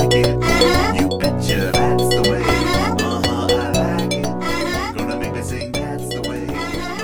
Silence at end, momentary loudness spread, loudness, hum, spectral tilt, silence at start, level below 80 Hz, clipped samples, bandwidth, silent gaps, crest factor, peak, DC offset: 0 s; 9 LU; -18 LUFS; none; -5 dB/octave; 0 s; -32 dBFS; under 0.1%; over 20 kHz; none; 14 dB; -4 dBFS; under 0.1%